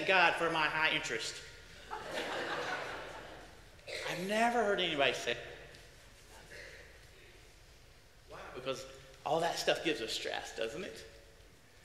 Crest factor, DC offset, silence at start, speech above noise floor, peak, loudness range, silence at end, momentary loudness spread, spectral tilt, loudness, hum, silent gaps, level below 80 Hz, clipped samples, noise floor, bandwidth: 24 dB; under 0.1%; 0 s; 25 dB; -12 dBFS; 14 LU; 0.05 s; 23 LU; -3 dB/octave; -34 LUFS; none; none; -64 dBFS; under 0.1%; -59 dBFS; 16 kHz